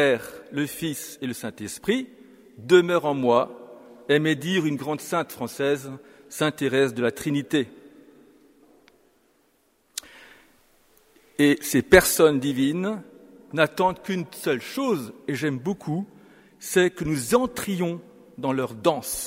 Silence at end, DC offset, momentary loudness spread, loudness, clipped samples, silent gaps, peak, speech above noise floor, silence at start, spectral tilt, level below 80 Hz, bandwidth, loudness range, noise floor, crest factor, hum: 0 s; under 0.1%; 17 LU; -24 LUFS; under 0.1%; none; 0 dBFS; 42 dB; 0 s; -4.5 dB/octave; -52 dBFS; 16 kHz; 7 LU; -65 dBFS; 24 dB; none